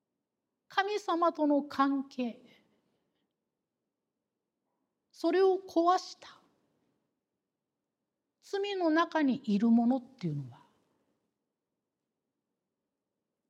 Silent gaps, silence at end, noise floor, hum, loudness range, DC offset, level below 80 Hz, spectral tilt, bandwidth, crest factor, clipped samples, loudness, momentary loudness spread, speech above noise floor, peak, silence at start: none; 2.95 s; -88 dBFS; none; 8 LU; under 0.1%; -88 dBFS; -6 dB/octave; 10.5 kHz; 20 dB; under 0.1%; -30 LUFS; 12 LU; 59 dB; -14 dBFS; 0.7 s